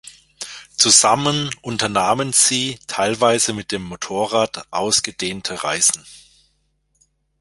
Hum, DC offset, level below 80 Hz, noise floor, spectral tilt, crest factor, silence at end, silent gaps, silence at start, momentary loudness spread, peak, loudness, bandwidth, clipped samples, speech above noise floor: none; under 0.1%; -54 dBFS; -66 dBFS; -2 dB/octave; 20 dB; 1.2 s; none; 0.05 s; 15 LU; 0 dBFS; -17 LUFS; 16 kHz; under 0.1%; 47 dB